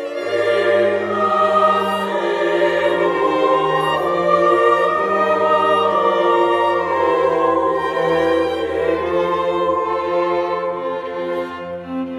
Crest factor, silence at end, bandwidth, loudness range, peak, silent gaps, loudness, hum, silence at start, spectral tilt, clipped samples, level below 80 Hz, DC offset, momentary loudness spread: 14 dB; 0 s; 13 kHz; 4 LU; -2 dBFS; none; -17 LUFS; none; 0 s; -5.5 dB/octave; under 0.1%; -54 dBFS; under 0.1%; 8 LU